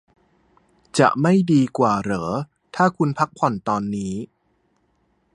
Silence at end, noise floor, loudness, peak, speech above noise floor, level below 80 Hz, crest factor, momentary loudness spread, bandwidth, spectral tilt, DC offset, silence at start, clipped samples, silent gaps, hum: 1.1 s; -66 dBFS; -20 LUFS; 0 dBFS; 47 dB; -56 dBFS; 22 dB; 12 LU; 11 kHz; -6.5 dB/octave; under 0.1%; 0.95 s; under 0.1%; none; none